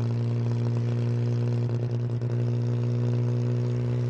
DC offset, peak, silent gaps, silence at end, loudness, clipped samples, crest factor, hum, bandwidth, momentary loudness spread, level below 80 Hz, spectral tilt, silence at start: under 0.1%; -14 dBFS; none; 0 s; -27 LUFS; under 0.1%; 10 dB; 60 Hz at -30 dBFS; 6.6 kHz; 2 LU; -60 dBFS; -9 dB/octave; 0 s